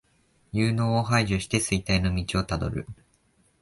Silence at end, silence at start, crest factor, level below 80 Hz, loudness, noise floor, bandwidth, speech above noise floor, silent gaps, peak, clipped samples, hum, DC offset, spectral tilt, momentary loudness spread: 0.7 s; 0.55 s; 18 dB; -40 dBFS; -26 LUFS; -65 dBFS; 11.5 kHz; 40 dB; none; -8 dBFS; under 0.1%; none; under 0.1%; -5 dB/octave; 9 LU